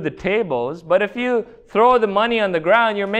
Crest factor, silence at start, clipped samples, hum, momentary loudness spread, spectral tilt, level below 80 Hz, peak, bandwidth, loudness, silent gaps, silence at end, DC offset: 16 dB; 0 s; under 0.1%; none; 8 LU; -6 dB/octave; -52 dBFS; -2 dBFS; 8.8 kHz; -18 LUFS; none; 0 s; under 0.1%